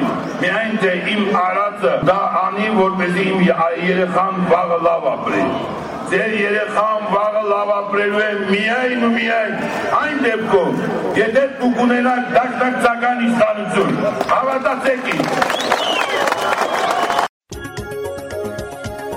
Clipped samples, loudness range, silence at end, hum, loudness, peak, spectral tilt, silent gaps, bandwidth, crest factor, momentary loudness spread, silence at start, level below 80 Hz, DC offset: under 0.1%; 2 LU; 0 s; none; -17 LUFS; -4 dBFS; -5 dB/octave; 17.29-17.40 s; 16 kHz; 14 dB; 6 LU; 0 s; -50 dBFS; under 0.1%